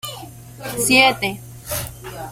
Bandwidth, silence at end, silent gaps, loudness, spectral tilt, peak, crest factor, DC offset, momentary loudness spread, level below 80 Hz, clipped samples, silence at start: 16.5 kHz; 0 s; none; -17 LUFS; -2.5 dB/octave; 0 dBFS; 20 dB; under 0.1%; 22 LU; -46 dBFS; under 0.1%; 0.05 s